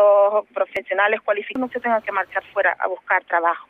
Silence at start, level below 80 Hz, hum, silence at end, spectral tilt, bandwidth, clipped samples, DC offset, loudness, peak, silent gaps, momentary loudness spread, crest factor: 0 s; -68 dBFS; none; 0.1 s; -5 dB/octave; 4 kHz; under 0.1%; under 0.1%; -21 LUFS; -4 dBFS; none; 7 LU; 16 dB